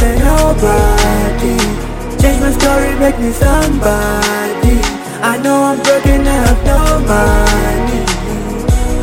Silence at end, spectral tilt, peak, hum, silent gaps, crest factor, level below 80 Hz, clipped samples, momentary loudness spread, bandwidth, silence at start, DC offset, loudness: 0 s; -5 dB/octave; 0 dBFS; none; none; 10 dB; -14 dBFS; under 0.1%; 5 LU; 17 kHz; 0 s; under 0.1%; -12 LUFS